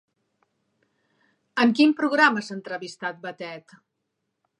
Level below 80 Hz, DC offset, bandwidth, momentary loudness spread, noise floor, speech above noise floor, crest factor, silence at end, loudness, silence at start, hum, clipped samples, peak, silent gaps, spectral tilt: -82 dBFS; under 0.1%; 10.5 kHz; 18 LU; -79 dBFS; 56 dB; 20 dB; 1 s; -22 LUFS; 1.55 s; none; under 0.1%; -6 dBFS; none; -4.5 dB/octave